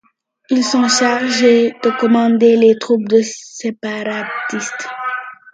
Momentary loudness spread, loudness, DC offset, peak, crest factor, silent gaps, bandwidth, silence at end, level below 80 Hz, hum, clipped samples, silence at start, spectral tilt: 12 LU; -15 LUFS; under 0.1%; 0 dBFS; 14 dB; none; 9.4 kHz; 0.2 s; -66 dBFS; none; under 0.1%; 0.5 s; -3.5 dB/octave